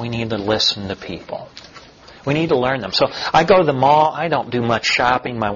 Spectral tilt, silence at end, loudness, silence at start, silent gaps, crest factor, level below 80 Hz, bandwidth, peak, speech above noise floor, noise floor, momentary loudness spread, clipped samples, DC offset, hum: -5 dB/octave; 0 s; -17 LUFS; 0 s; none; 16 dB; -48 dBFS; 7.4 kHz; -2 dBFS; 25 dB; -42 dBFS; 16 LU; under 0.1%; under 0.1%; none